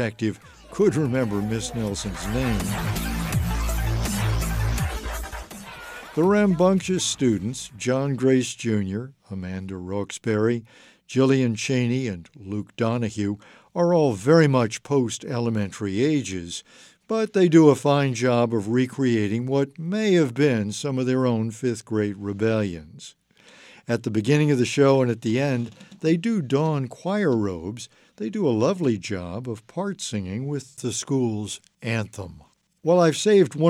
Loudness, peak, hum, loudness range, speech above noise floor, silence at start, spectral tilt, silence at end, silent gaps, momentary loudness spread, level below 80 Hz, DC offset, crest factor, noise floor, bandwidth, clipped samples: -23 LUFS; -4 dBFS; none; 6 LU; 29 dB; 0 s; -6 dB/octave; 0 s; none; 14 LU; -40 dBFS; under 0.1%; 20 dB; -51 dBFS; 16 kHz; under 0.1%